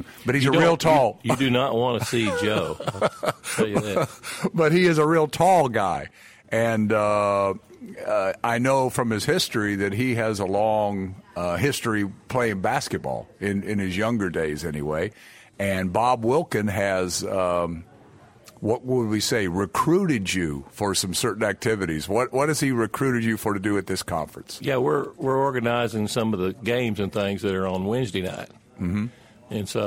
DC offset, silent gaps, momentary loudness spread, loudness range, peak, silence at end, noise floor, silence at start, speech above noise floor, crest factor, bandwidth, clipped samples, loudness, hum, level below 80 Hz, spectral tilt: under 0.1%; none; 10 LU; 4 LU; -6 dBFS; 0 s; -51 dBFS; 0 s; 27 dB; 18 dB; 16.5 kHz; under 0.1%; -24 LUFS; none; -54 dBFS; -5 dB/octave